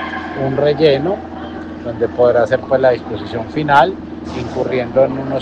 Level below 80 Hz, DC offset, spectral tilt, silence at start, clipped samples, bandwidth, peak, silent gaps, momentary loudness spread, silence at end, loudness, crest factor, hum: -46 dBFS; under 0.1%; -7 dB/octave; 0 s; under 0.1%; 8.4 kHz; 0 dBFS; none; 14 LU; 0 s; -16 LUFS; 16 dB; none